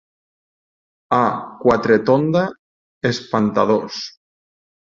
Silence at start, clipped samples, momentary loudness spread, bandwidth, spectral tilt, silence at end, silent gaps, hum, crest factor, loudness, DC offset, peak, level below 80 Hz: 1.1 s; under 0.1%; 11 LU; 7.6 kHz; -6.5 dB/octave; 0.8 s; 2.59-3.01 s; none; 18 dB; -18 LUFS; under 0.1%; -2 dBFS; -56 dBFS